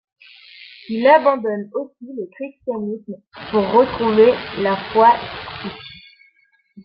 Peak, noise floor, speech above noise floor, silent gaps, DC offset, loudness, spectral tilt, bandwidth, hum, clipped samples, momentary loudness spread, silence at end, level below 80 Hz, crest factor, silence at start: -2 dBFS; -60 dBFS; 42 dB; none; under 0.1%; -17 LUFS; -8.5 dB/octave; 5.6 kHz; none; under 0.1%; 19 LU; 0.05 s; -54 dBFS; 18 dB; 0.6 s